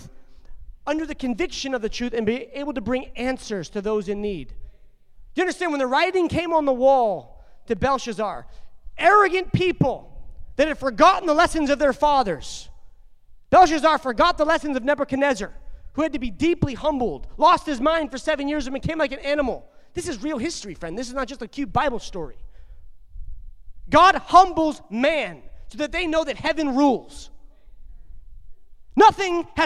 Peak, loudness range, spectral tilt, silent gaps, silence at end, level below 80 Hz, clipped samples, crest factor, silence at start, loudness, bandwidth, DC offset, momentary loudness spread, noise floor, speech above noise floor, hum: -2 dBFS; 8 LU; -5 dB/octave; none; 0 s; -42 dBFS; under 0.1%; 20 dB; 0 s; -21 LUFS; 12.5 kHz; under 0.1%; 16 LU; -47 dBFS; 26 dB; none